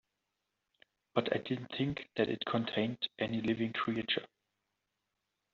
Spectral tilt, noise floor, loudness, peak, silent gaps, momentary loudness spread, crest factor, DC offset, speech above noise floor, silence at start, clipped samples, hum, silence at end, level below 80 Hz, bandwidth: -3.5 dB/octave; -86 dBFS; -35 LUFS; -14 dBFS; none; 3 LU; 24 dB; under 0.1%; 51 dB; 1.15 s; under 0.1%; none; 1.3 s; -72 dBFS; 7 kHz